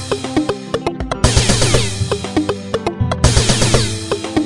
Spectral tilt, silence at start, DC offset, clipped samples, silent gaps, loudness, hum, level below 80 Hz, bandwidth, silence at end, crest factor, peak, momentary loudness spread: -4 dB/octave; 0 s; under 0.1%; under 0.1%; none; -16 LUFS; none; -26 dBFS; 11.5 kHz; 0 s; 16 dB; 0 dBFS; 8 LU